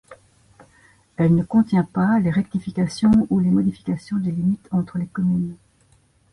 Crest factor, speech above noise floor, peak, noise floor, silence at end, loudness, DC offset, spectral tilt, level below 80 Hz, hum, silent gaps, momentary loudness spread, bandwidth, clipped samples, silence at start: 14 dB; 39 dB; -8 dBFS; -58 dBFS; 0.8 s; -21 LUFS; under 0.1%; -8.5 dB/octave; -50 dBFS; none; none; 8 LU; 11 kHz; under 0.1%; 0.1 s